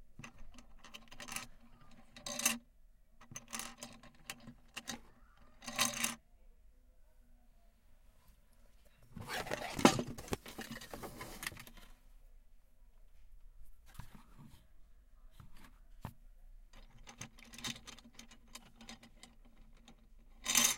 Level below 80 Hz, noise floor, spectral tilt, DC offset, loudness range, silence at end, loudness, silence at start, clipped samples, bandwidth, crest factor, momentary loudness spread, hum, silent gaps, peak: -60 dBFS; -64 dBFS; -2 dB/octave; under 0.1%; 21 LU; 0 s; -39 LUFS; 0 s; under 0.1%; 17 kHz; 36 dB; 27 LU; none; none; -8 dBFS